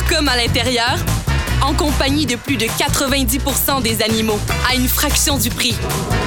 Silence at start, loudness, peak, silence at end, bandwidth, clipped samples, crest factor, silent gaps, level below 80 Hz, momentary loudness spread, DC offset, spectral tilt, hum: 0 s; -16 LUFS; -4 dBFS; 0 s; over 20 kHz; under 0.1%; 14 dB; none; -24 dBFS; 4 LU; 0.1%; -3.5 dB/octave; none